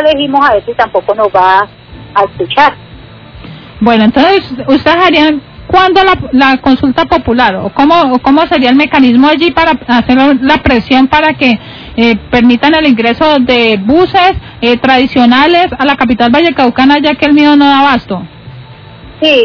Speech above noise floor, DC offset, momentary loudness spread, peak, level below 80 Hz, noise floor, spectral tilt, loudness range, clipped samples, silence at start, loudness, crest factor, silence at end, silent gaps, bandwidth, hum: 24 dB; under 0.1%; 6 LU; 0 dBFS; -34 dBFS; -31 dBFS; -6.5 dB/octave; 3 LU; 5%; 0 s; -7 LUFS; 8 dB; 0 s; none; 5.4 kHz; none